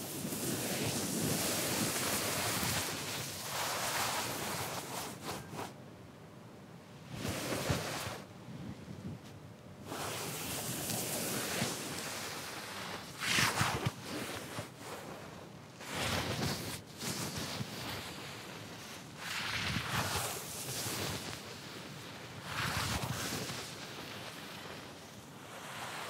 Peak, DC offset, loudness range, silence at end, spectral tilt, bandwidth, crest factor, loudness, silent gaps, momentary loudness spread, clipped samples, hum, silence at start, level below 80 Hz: -16 dBFS; under 0.1%; 7 LU; 0 s; -3 dB/octave; 16 kHz; 24 dB; -37 LUFS; none; 15 LU; under 0.1%; none; 0 s; -62 dBFS